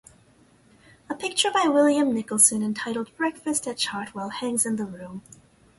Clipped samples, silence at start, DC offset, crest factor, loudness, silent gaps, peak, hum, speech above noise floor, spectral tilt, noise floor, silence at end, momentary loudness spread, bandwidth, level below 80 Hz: under 0.1%; 1.1 s; under 0.1%; 22 dB; -23 LUFS; none; -4 dBFS; none; 33 dB; -2 dB/octave; -58 dBFS; 0.6 s; 16 LU; 12 kHz; -66 dBFS